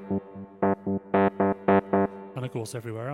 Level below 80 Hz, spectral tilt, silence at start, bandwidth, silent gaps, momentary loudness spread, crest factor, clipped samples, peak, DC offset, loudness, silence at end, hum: -64 dBFS; -7.5 dB/octave; 0 s; 13 kHz; none; 12 LU; 22 dB; under 0.1%; -4 dBFS; under 0.1%; -27 LUFS; 0 s; none